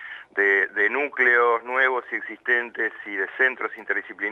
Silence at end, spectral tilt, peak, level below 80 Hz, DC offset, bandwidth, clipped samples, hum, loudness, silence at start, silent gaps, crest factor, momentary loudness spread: 0 s; -4 dB/octave; -6 dBFS; -78 dBFS; under 0.1%; 6.6 kHz; under 0.1%; none; -22 LUFS; 0 s; none; 18 dB; 10 LU